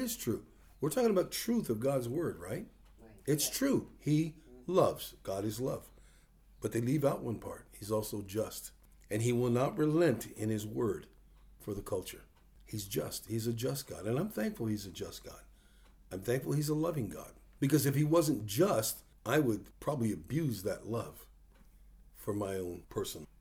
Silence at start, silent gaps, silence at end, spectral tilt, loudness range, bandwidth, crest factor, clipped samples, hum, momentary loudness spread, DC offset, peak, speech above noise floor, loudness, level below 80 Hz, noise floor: 0 s; none; 0.15 s; -5.5 dB/octave; 6 LU; over 20 kHz; 20 dB; under 0.1%; none; 14 LU; under 0.1%; -14 dBFS; 28 dB; -35 LUFS; -60 dBFS; -62 dBFS